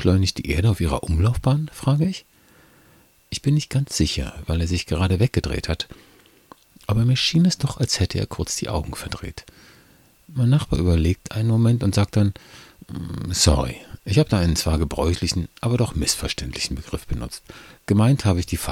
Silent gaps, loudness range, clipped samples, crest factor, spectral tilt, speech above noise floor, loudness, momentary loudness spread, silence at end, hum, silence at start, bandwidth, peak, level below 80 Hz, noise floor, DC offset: none; 3 LU; under 0.1%; 18 dB; -5.5 dB/octave; 34 dB; -22 LUFS; 14 LU; 0 s; none; 0 s; 16 kHz; -4 dBFS; -34 dBFS; -55 dBFS; under 0.1%